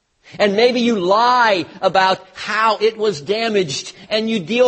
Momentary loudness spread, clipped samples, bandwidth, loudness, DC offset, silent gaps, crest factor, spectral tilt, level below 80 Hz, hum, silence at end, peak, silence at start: 8 LU; under 0.1%; 8.8 kHz; -17 LUFS; under 0.1%; none; 16 dB; -4 dB/octave; -62 dBFS; none; 0 s; -2 dBFS; 0.35 s